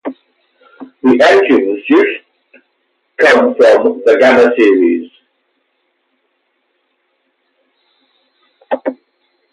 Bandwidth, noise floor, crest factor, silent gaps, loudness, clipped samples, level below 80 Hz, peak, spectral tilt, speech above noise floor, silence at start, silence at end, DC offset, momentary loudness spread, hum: 11 kHz; -64 dBFS; 14 dB; none; -10 LUFS; under 0.1%; -60 dBFS; 0 dBFS; -4.5 dB/octave; 55 dB; 0.05 s; 0.6 s; under 0.1%; 14 LU; none